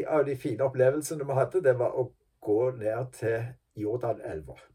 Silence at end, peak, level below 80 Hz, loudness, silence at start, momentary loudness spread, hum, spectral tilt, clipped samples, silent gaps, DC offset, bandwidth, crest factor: 0.2 s; -12 dBFS; -62 dBFS; -29 LUFS; 0 s; 11 LU; none; -7 dB/octave; under 0.1%; none; under 0.1%; 15.5 kHz; 18 dB